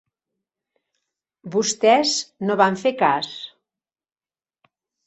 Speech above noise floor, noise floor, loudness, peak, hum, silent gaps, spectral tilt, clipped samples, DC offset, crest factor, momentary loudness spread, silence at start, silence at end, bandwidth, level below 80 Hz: over 70 dB; under -90 dBFS; -20 LUFS; 0 dBFS; none; none; -3 dB/octave; under 0.1%; under 0.1%; 22 dB; 13 LU; 1.45 s; 1.6 s; 8.2 kHz; -70 dBFS